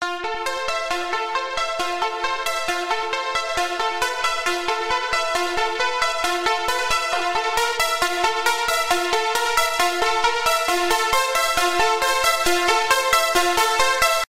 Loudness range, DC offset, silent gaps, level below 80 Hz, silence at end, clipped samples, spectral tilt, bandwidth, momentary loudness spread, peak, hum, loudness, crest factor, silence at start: 5 LU; under 0.1%; none; -46 dBFS; 0.05 s; under 0.1%; -0.5 dB/octave; 16 kHz; 6 LU; -4 dBFS; none; -20 LUFS; 18 dB; 0 s